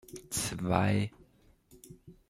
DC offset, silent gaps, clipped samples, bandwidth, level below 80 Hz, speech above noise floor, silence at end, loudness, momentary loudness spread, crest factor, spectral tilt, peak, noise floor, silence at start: under 0.1%; none; under 0.1%; 15.5 kHz; -58 dBFS; 32 dB; 0.2 s; -32 LUFS; 22 LU; 24 dB; -5 dB/octave; -10 dBFS; -64 dBFS; 0.1 s